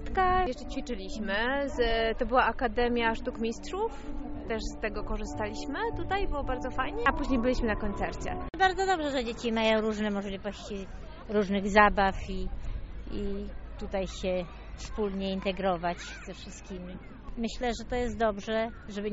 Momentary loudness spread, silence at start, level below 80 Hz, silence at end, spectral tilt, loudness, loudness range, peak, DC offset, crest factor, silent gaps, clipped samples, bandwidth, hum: 15 LU; 0 s; -40 dBFS; 0 s; -3.5 dB/octave; -30 LUFS; 6 LU; -6 dBFS; under 0.1%; 24 dB; none; under 0.1%; 8 kHz; none